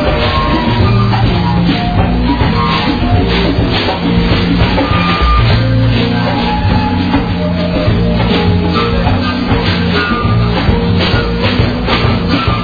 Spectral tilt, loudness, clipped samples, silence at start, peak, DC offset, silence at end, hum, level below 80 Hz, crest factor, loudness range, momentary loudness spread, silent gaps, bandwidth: -8 dB/octave; -12 LUFS; under 0.1%; 0 s; 0 dBFS; 0.7%; 0 s; none; -20 dBFS; 10 dB; 1 LU; 2 LU; none; 5 kHz